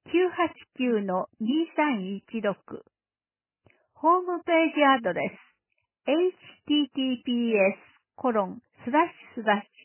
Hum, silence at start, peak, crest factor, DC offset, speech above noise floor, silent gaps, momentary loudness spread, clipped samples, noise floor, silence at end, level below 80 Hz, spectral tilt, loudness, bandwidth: none; 0.05 s; -10 dBFS; 18 dB; under 0.1%; over 64 dB; none; 11 LU; under 0.1%; under -90 dBFS; 0.2 s; -74 dBFS; -9 dB/octave; -26 LUFS; 3.2 kHz